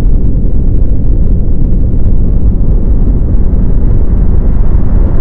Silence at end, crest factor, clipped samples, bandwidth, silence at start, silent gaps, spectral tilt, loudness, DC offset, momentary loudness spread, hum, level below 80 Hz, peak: 0 s; 6 dB; 3%; 1.9 kHz; 0 s; none; -12.5 dB/octave; -12 LUFS; under 0.1%; 1 LU; none; -8 dBFS; 0 dBFS